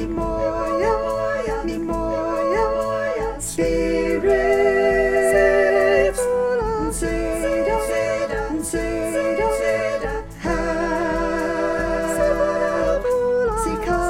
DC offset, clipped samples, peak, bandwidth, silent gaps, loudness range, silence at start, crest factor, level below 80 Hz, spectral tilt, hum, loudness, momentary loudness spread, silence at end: under 0.1%; under 0.1%; -4 dBFS; 16.5 kHz; none; 4 LU; 0 s; 16 dB; -34 dBFS; -5 dB/octave; none; -20 LUFS; 7 LU; 0 s